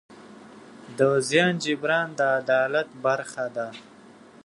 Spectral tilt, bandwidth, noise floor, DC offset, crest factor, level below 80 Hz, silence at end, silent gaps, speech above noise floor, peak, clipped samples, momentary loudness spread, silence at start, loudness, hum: -4.5 dB/octave; 11.5 kHz; -49 dBFS; under 0.1%; 20 dB; -74 dBFS; 0.65 s; none; 26 dB; -6 dBFS; under 0.1%; 12 LU; 0.1 s; -24 LUFS; none